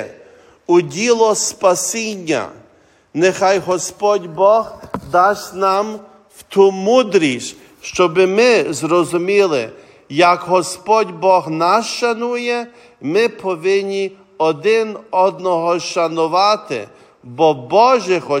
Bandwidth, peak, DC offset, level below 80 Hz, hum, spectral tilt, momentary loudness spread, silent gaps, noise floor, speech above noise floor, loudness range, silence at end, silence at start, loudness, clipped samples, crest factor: 16 kHz; 0 dBFS; under 0.1%; -60 dBFS; none; -4 dB/octave; 13 LU; none; -51 dBFS; 36 dB; 3 LU; 0 s; 0 s; -16 LUFS; under 0.1%; 16 dB